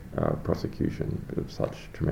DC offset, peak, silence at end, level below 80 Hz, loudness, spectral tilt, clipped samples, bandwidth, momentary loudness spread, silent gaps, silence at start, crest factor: under 0.1%; -12 dBFS; 0 s; -44 dBFS; -31 LUFS; -8 dB/octave; under 0.1%; 16.5 kHz; 5 LU; none; 0 s; 18 dB